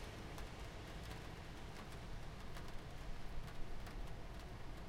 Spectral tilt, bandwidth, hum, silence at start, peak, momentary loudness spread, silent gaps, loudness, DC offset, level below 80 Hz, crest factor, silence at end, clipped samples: -5 dB/octave; 16 kHz; none; 0 s; -32 dBFS; 2 LU; none; -53 LUFS; under 0.1%; -52 dBFS; 16 dB; 0 s; under 0.1%